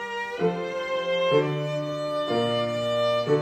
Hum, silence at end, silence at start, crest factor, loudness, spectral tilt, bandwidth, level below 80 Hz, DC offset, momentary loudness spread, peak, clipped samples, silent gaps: none; 0 s; 0 s; 16 dB; -26 LUFS; -6 dB/octave; 15 kHz; -66 dBFS; under 0.1%; 6 LU; -10 dBFS; under 0.1%; none